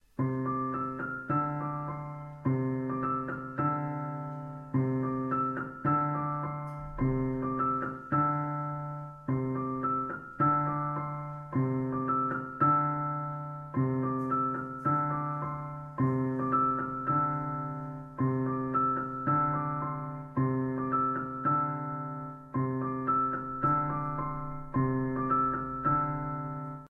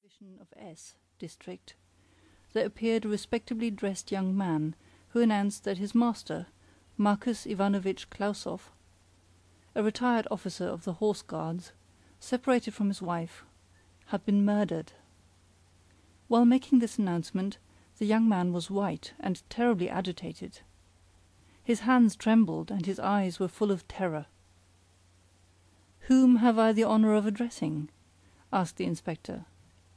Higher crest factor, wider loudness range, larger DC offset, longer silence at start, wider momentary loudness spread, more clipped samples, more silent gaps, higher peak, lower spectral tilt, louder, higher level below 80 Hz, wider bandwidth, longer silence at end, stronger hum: about the same, 16 dB vs 16 dB; second, 3 LU vs 7 LU; neither; about the same, 0.2 s vs 0.2 s; second, 9 LU vs 19 LU; neither; neither; about the same, -14 dBFS vs -14 dBFS; first, -11 dB/octave vs -6.5 dB/octave; about the same, -31 LUFS vs -29 LUFS; first, -56 dBFS vs -64 dBFS; second, 3.1 kHz vs 11 kHz; second, 0 s vs 0.55 s; neither